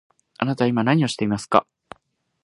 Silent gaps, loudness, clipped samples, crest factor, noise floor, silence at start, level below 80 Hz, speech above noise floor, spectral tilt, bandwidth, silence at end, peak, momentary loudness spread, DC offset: none; -21 LUFS; under 0.1%; 22 dB; -67 dBFS; 0.4 s; -60 dBFS; 47 dB; -6 dB/octave; 11.5 kHz; 0.8 s; 0 dBFS; 6 LU; under 0.1%